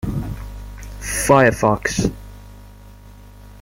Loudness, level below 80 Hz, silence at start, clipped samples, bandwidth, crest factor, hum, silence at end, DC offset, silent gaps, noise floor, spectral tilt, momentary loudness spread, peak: -17 LUFS; -34 dBFS; 0.05 s; under 0.1%; 16.5 kHz; 20 dB; 50 Hz at -35 dBFS; 0 s; under 0.1%; none; -41 dBFS; -5 dB/octave; 23 LU; -2 dBFS